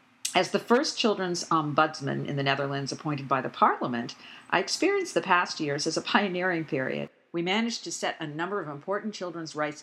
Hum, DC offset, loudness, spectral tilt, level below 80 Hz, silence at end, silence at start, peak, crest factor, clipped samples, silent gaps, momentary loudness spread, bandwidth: none; under 0.1%; -28 LUFS; -4 dB/octave; -82 dBFS; 0 s; 0.25 s; -4 dBFS; 24 dB; under 0.1%; none; 9 LU; 15 kHz